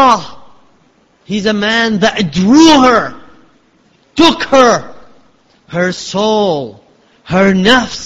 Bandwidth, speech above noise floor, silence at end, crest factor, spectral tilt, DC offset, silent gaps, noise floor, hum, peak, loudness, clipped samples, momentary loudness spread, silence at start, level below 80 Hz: 11 kHz; 41 dB; 0 s; 12 dB; -4.5 dB/octave; under 0.1%; none; -51 dBFS; none; 0 dBFS; -10 LUFS; 0.2%; 14 LU; 0 s; -42 dBFS